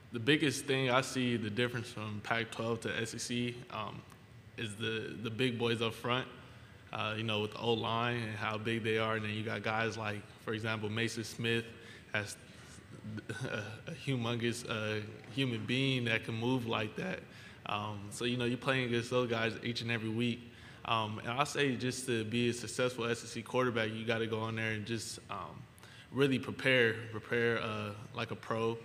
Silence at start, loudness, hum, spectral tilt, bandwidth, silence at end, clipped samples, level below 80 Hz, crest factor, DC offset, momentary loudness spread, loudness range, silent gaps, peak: 0 s; -35 LUFS; none; -5 dB/octave; 15.5 kHz; 0 s; under 0.1%; -68 dBFS; 24 dB; under 0.1%; 12 LU; 4 LU; none; -12 dBFS